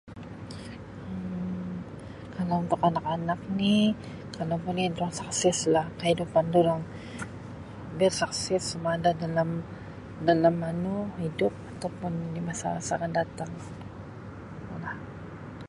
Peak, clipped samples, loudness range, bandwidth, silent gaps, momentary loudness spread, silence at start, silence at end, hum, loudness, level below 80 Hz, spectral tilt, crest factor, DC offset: -8 dBFS; under 0.1%; 5 LU; 11.5 kHz; none; 18 LU; 0.05 s; 0 s; none; -28 LUFS; -54 dBFS; -5 dB/octave; 22 dB; under 0.1%